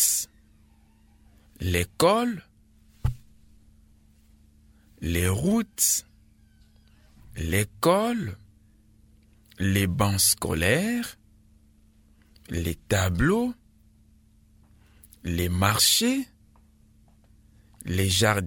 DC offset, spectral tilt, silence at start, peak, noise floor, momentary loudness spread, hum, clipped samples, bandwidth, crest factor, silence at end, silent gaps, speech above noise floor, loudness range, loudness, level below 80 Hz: under 0.1%; -3.5 dB/octave; 0 s; -2 dBFS; -58 dBFS; 16 LU; none; under 0.1%; 17.5 kHz; 26 dB; 0 s; none; 34 dB; 4 LU; -24 LUFS; -44 dBFS